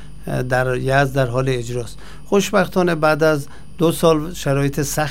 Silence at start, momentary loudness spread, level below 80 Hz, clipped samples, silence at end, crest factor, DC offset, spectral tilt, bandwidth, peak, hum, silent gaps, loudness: 0 s; 10 LU; -40 dBFS; under 0.1%; 0 s; 18 dB; 3%; -5.5 dB/octave; 16 kHz; 0 dBFS; none; none; -18 LUFS